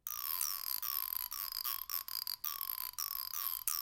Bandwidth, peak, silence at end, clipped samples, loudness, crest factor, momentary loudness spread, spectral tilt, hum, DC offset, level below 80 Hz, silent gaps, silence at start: 17 kHz; -16 dBFS; 0 s; under 0.1%; -37 LUFS; 24 dB; 3 LU; 3 dB/octave; none; under 0.1%; -70 dBFS; none; 0.05 s